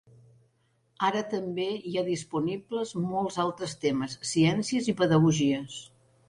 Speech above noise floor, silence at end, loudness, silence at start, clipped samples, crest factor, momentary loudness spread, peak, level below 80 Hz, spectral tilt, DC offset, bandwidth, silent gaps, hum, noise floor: 42 dB; 0.4 s; -28 LUFS; 1 s; under 0.1%; 16 dB; 9 LU; -12 dBFS; -62 dBFS; -5.5 dB/octave; under 0.1%; 11 kHz; none; none; -70 dBFS